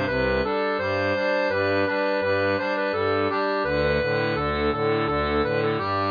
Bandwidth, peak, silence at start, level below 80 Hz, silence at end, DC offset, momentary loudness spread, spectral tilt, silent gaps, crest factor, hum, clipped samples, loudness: 5.2 kHz; -10 dBFS; 0 s; -42 dBFS; 0 s; under 0.1%; 2 LU; -7 dB/octave; none; 14 dB; none; under 0.1%; -23 LUFS